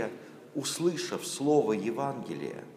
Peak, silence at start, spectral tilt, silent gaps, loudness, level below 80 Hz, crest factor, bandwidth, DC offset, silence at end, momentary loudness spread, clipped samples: -12 dBFS; 0 s; -4.5 dB/octave; none; -31 LUFS; -80 dBFS; 18 dB; 15.5 kHz; under 0.1%; 0 s; 12 LU; under 0.1%